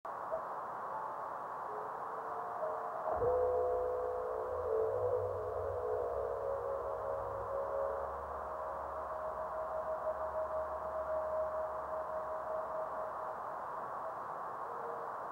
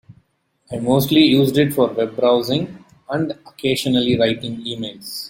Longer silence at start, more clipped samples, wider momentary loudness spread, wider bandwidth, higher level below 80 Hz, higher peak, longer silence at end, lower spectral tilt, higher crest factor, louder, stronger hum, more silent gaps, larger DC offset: about the same, 0.05 s vs 0.1 s; neither; second, 7 LU vs 13 LU; about the same, 16.5 kHz vs 16.5 kHz; second, -60 dBFS vs -54 dBFS; second, -22 dBFS vs -2 dBFS; about the same, 0 s vs 0 s; first, -7 dB/octave vs -5.5 dB/octave; about the same, 16 dB vs 18 dB; second, -39 LUFS vs -18 LUFS; neither; neither; neither